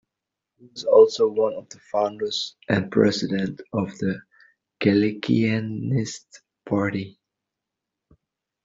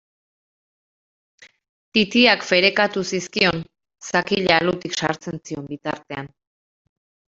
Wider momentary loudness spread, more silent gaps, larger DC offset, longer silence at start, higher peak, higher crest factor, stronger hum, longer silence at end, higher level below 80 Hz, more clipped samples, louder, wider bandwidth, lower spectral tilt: second, 14 LU vs 17 LU; neither; neither; second, 0.75 s vs 1.95 s; about the same, -4 dBFS vs -2 dBFS; about the same, 20 dB vs 22 dB; neither; first, 1.55 s vs 1.05 s; about the same, -62 dBFS vs -58 dBFS; neither; second, -23 LUFS vs -19 LUFS; about the same, 7.8 kHz vs 7.8 kHz; first, -6 dB/octave vs -4 dB/octave